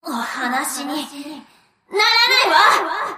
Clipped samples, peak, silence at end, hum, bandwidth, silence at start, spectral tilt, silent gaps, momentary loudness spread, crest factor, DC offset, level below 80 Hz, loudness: under 0.1%; -2 dBFS; 0 s; none; 15.5 kHz; 0.05 s; 0 dB/octave; none; 17 LU; 16 dB; under 0.1%; -66 dBFS; -16 LUFS